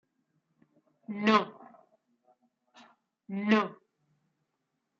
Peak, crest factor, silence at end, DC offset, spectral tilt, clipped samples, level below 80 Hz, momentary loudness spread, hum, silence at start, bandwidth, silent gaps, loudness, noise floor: -12 dBFS; 24 dB; 1.25 s; under 0.1%; -6 dB/octave; under 0.1%; -84 dBFS; 17 LU; none; 1.1 s; 7.4 kHz; none; -28 LUFS; -82 dBFS